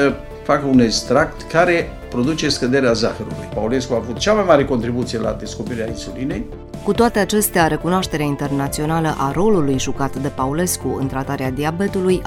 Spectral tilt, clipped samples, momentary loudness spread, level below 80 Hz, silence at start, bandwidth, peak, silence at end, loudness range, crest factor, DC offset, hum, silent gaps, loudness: -5 dB/octave; under 0.1%; 10 LU; -36 dBFS; 0 s; 16.5 kHz; 0 dBFS; 0 s; 3 LU; 18 dB; under 0.1%; none; none; -18 LUFS